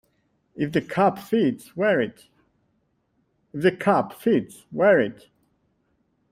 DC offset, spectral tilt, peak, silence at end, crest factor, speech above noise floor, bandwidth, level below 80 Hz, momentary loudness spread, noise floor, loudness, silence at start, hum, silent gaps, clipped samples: under 0.1%; -7 dB/octave; -6 dBFS; 1.2 s; 18 dB; 48 dB; 16 kHz; -64 dBFS; 11 LU; -70 dBFS; -23 LUFS; 0.55 s; none; none; under 0.1%